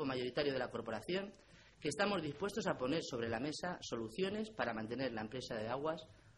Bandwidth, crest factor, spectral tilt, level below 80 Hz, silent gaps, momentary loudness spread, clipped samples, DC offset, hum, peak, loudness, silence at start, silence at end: 13 kHz; 20 dB; -5 dB/octave; -68 dBFS; none; 6 LU; under 0.1%; under 0.1%; none; -20 dBFS; -41 LUFS; 0 s; 0.05 s